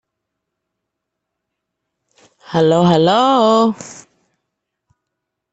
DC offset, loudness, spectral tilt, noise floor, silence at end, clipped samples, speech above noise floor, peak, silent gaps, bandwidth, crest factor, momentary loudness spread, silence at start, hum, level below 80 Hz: under 0.1%; -13 LUFS; -6 dB/octave; -78 dBFS; 1.6 s; under 0.1%; 65 dB; -2 dBFS; none; 8.2 kHz; 16 dB; 13 LU; 2.5 s; none; -58 dBFS